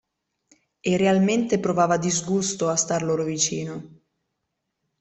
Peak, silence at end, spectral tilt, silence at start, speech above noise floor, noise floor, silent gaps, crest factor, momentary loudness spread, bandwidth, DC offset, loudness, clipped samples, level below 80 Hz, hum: -6 dBFS; 1.15 s; -4.5 dB/octave; 0.85 s; 57 dB; -79 dBFS; none; 18 dB; 10 LU; 8.4 kHz; under 0.1%; -22 LUFS; under 0.1%; -60 dBFS; none